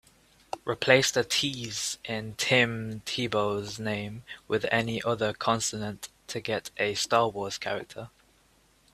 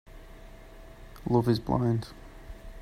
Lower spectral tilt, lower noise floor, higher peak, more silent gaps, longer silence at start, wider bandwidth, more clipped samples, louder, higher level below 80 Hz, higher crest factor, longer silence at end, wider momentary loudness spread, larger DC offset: second, -3 dB/octave vs -8 dB/octave; first, -64 dBFS vs -48 dBFS; first, -4 dBFS vs -10 dBFS; neither; first, 0.55 s vs 0.1 s; about the same, 15.5 kHz vs 14.5 kHz; neither; about the same, -28 LUFS vs -28 LUFS; second, -62 dBFS vs -46 dBFS; about the same, 24 dB vs 20 dB; first, 0.85 s vs 0 s; second, 14 LU vs 25 LU; neither